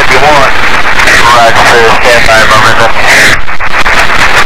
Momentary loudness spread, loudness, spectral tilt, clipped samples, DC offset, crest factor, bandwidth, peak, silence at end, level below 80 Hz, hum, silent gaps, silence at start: 4 LU; -3 LUFS; -2.5 dB/octave; 9%; 40%; 6 dB; 17 kHz; 0 dBFS; 0 s; -20 dBFS; none; none; 0 s